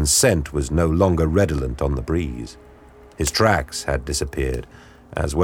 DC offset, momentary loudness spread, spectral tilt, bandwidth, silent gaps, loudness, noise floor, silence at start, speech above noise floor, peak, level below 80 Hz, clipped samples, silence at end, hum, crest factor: under 0.1%; 11 LU; -4.5 dB/octave; 17.5 kHz; none; -21 LUFS; -46 dBFS; 0 s; 26 dB; -2 dBFS; -30 dBFS; under 0.1%; 0 s; none; 18 dB